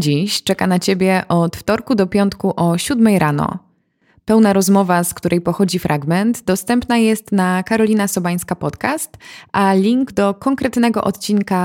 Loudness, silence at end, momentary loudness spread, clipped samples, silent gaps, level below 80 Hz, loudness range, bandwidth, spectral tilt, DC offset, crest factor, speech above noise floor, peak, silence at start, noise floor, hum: -16 LUFS; 0 s; 7 LU; under 0.1%; none; -48 dBFS; 2 LU; 17 kHz; -5.5 dB/octave; under 0.1%; 14 dB; 43 dB; -2 dBFS; 0 s; -59 dBFS; none